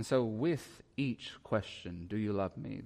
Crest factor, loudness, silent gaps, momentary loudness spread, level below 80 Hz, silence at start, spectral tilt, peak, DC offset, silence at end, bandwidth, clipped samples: 16 dB; -37 LUFS; none; 11 LU; -64 dBFS; 0 s; -6.5 dB/octave; -20 dBFS; under 0.1%; 0 s; 15 kHz; under 0.1%